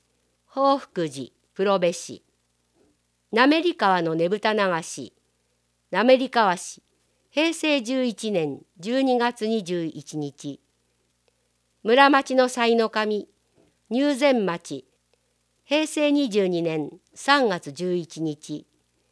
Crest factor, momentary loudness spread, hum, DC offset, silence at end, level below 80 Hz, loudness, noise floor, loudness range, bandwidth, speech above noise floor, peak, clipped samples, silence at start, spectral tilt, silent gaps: 24 dB; 17 LU; 60 Hz at -55 dBFS; under 0.1%; 0.5 s; -78 dBFS; -23 LUFS; -70 dBFS; 4 LU; 11 kHz; 48 dB; 0 dBFS; under 0.1%; 0.55 s; -4.5 dB/octave; none